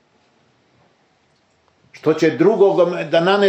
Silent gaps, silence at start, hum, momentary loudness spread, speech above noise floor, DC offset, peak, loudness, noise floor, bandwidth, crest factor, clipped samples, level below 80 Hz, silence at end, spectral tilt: none; 1.95 s; none; 6 LU; 46 dB; under 0.1%; -2 dBFS; -16 LUFS; -60 dBFS; 8.4 kHz; 16 dB; under 0.1%; -70 dBFS; 0 s; -6 dB/octave